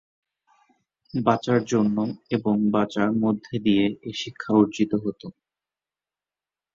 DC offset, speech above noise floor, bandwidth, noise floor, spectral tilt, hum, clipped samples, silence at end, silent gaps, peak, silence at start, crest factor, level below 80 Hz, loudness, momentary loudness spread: under 0.1%; over 67 dB; 7.6 kHz; under -90 dBFS; -6.5 dB/octave; 50 Hz at -50 dBFS; under 0.1%; 1.45 s; none; -4 dBFS; 1.15 s; 20 dB; -62 dBFS; -24 LUFS; 11 LU